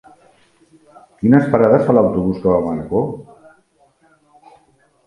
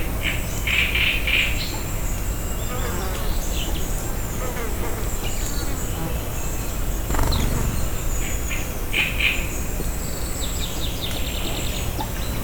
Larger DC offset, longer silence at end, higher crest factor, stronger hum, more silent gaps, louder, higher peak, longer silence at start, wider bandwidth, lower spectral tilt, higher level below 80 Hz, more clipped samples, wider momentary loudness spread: neither; first, 1.85 s vs 0 s; about the same, 18 dB vs 18 dB; neither; neither; first, -15 LUFS vs -24 LUFS; first, 0 dBFS vs -6 dBFS; first, 1.2 s vs 0 s; second, 10.5 kHz vs over 20 kHz; first, -10 dB/octave vs -3.5 dB/octave; second, -46 dBFS vs -26 dBFS; neither; about the same, 9 LU vs 8 LU